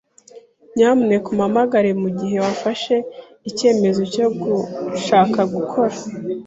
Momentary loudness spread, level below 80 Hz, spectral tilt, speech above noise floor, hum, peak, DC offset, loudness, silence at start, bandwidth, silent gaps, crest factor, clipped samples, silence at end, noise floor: 11 LU; -60 dBFS; -6 dB/octave; 27 dB; none; -2 dBFS; under 0.1%; -18 LUFS; 0.35 s; 8 kHz; none; 16 dB; under 0.1%; 0 s; -45 dBFS